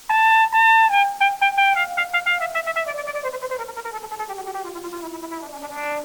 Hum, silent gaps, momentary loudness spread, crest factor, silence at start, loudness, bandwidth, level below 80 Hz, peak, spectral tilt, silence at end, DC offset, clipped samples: none; none; 18 LU; 16 dB; 0 s; -18 LUFS; over 20 kHz; -62 dBFS; -6 dBFS; -0.5 dB/octave; 0 s; under 0.1%; under 0.1%